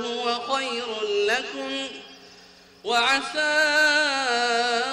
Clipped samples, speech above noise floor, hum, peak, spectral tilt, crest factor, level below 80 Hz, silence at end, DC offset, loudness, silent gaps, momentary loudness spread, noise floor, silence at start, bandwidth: under 0.1%; 27 dB; none; -10 dBFS; -0.5 dB/octave; 14 dB; -66 dBFS; 0 s; under 0.1%; -22 LUFS; none; 11 LU; -50 dBFS; 0 s; 14.5 kHz